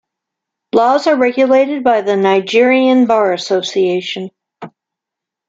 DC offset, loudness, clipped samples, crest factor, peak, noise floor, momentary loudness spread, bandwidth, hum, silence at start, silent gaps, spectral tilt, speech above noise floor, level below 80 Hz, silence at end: under 0.1%; -13 LUFS; under 0.1%; 12 dB; -2 dBFS; -83 dBFS; 7 LU; 7.8 kHz; none; 0.75 s; none; -5 dB/octave; 71 dB; -62 dBFS; 0.8 s